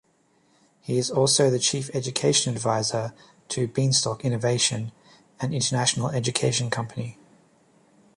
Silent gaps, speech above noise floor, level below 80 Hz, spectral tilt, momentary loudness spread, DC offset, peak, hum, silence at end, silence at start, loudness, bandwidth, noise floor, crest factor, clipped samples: none; 40 dB; -62 dBFS; -3.5 dB/octave; 13 LU; under 0.1%; -6 dBFS; none; 1.05 s; 0.85 s; -24 LUFS; 11.5 kHz; -64 dBFS; 20 dB; under 0.1%